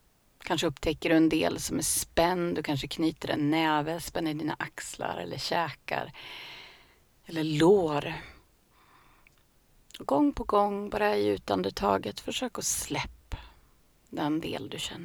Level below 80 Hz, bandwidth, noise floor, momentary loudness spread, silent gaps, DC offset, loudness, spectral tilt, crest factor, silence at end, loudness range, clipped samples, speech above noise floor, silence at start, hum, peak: -52 dBFS; over 20 kHz; -63 dBFS; 16 LU; none; under 0.1%; -29 LUFS; -4 dB/octave; 22 dB; 0 s; 5 LU; under 0.1%; 35 dB; 0.45 s; none; -8 dBFS